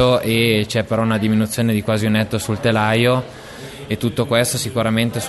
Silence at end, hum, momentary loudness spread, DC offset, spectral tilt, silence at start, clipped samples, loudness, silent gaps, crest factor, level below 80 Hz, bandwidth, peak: 0 s; none; 8 LU; under 0.1%; -5 dB/octave; 0 s; under 0.1%; -18 LUFS; none; 16 dB; -46 dBFS; 12.5 kHz; -2 dBFS